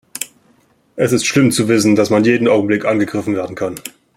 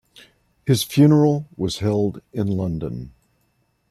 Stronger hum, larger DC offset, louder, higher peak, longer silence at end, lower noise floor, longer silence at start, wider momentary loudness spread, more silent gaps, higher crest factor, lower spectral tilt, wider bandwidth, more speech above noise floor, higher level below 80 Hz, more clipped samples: neither; neither; first, -15 LUFS vs -20 LUFS; first, 0 dBFS vs -4 dBFS; second, 0.25 s vs 0.8 s; second, -55 dBFS vs -66 dBFS; second, 0.15 s vs 0.65 s; about the same, 14 LU vs 16 LU; neither; about the same, 14 dB vs 18 dB; second, -5 dB/octave vs -7 dB/octave; first, 16.5 kHz vs 14 kHz; second, 41 dB vs 47 dB; second, -56 dBFS vs -50 dBFS; neither